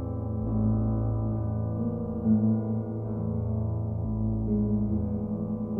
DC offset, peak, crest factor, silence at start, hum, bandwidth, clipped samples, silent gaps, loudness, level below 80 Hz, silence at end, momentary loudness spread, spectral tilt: under 0.1%; -14 dBFS; 14 dB; 0 s; none; 1.6 kHz; under 0.1%; none; -29 LUFS; -40 dBFS; 0 s; 6 LU; -14.5 dB/octave